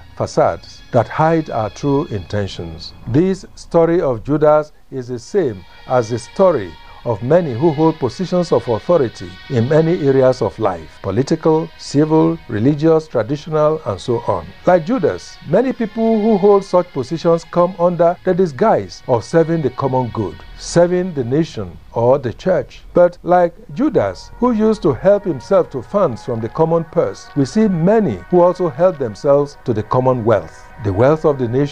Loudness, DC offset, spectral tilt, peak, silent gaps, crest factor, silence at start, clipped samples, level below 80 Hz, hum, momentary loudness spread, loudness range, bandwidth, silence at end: -16 LUFS; 0.7%; -7.5 dB/octave; 0 dBFS; none; 16 dB; 0 s; under 0.1%; -42 dBFS; none; 9 LU; 2 LU; 10 kHz; 0 s